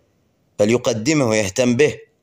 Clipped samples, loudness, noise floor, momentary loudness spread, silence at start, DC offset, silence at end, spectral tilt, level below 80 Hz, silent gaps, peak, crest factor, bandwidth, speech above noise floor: under 0.1%; -18 LUFS; -62 dBFS; 2 LU; 0.6 s; under 0.1%; 0.2 s; -4.5 dB/octave; -54 dBFS; none; -4 dBFS; 16 dB; 15.5 kHz; 45 dB